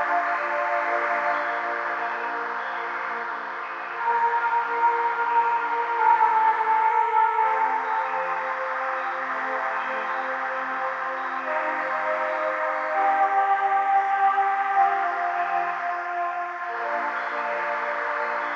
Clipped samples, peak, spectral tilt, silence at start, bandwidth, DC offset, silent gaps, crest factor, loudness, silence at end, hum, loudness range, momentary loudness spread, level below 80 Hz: under 0.1%; -8 dBFS; -3 dB/octave; 0 s; 7.4 kHz; under 0.1%; none; 16 dB; -24 LUFS; 0 s; none; 5 LU; 7 LU; under -90 dBFS